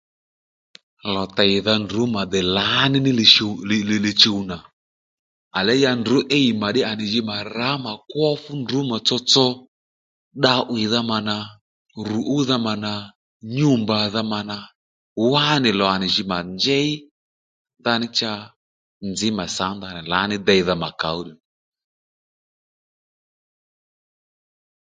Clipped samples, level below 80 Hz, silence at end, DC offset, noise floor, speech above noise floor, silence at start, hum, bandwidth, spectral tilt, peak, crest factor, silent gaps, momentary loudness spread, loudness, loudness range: under 0.1%; -54 dBFS; 3.55 s; under 0.1%; under -90 dBFS; over 70 dB; 1.05 s; none; 9.4 kHz; -4.5 dB/octave; 0 dBFS; 22 dB; 4.73-5.51 s, 9.68-10.31 s, 11.61-11.85 s, 13.15-13.40 s, 14.75-15.16 s, 17.11-17.65 s, 18.56-19.00 s; 13 LU; -19 LUFS; 7 LU